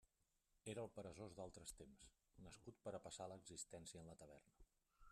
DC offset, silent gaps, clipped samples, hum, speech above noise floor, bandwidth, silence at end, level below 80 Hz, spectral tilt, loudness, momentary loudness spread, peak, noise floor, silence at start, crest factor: under 0.1%; none; under 0.1%; none; 29 dB; 13 kHz; 0 s; -76 dBFS; -4 dB/octave; -57 LUFS; 12 LU; -38 dBFS; -87 dBFS; 0.55 s; 20 dB